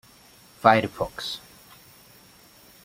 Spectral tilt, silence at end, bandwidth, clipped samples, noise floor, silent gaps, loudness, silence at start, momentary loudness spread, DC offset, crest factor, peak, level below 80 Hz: -5 dB/octave; 1.45 s; 16.5 kHz; under 0.1%; -53 dBFS; none; -23 LUFS; 0.65 s; 14 LU; under 0.1%; 26 dB; -2 dBFS; -58 dBFS